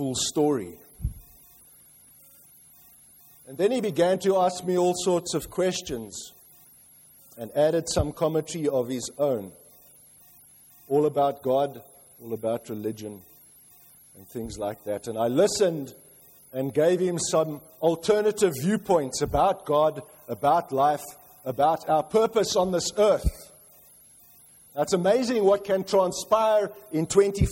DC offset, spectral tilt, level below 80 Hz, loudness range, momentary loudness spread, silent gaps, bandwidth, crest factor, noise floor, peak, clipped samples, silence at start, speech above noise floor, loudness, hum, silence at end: under 0.1%; -5 dB/octave; -44 dBFS; 6 LU; 15 LU; none; 16.5 kHz; 18 dB; -54 dBFS; -8 dBFS; under 0.1%; 0 s; 29 dB; -25 LUFS; none; 0 s